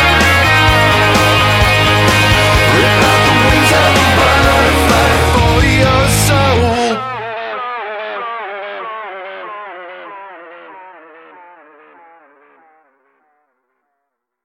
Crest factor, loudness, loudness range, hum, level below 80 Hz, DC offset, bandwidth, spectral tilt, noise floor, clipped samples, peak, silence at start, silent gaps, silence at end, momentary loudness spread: 12 dB; -10 LUFS; 19 LU; none; -24 dBFS; under 0.1%; 16.5 kHz; -4 dB/octave; -73 dBFS; under 0.1%; 0 dBFS; 0 s; none; 3.55 s; 18 LU